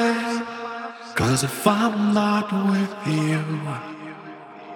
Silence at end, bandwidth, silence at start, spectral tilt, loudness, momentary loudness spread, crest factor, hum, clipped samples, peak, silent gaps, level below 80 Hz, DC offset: 0 s; 19 kHz; 0 s; -5.5 dB/octave; -23 LUFS; 17 LU; 22 dB; none; under 0.1%; -2 dBFS; none; -56 dBFS; under 0.1%